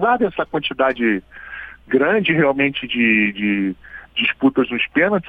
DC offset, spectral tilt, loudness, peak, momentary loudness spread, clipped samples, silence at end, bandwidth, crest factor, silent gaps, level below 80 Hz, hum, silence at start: under 0.1%; -8 dB/octave; -18 LUFS; -2 dBFS; 12 LU; under 0.1%; 0 s; 4.8 kHz; 16 dB; none; -50 dBFS; none; 0 s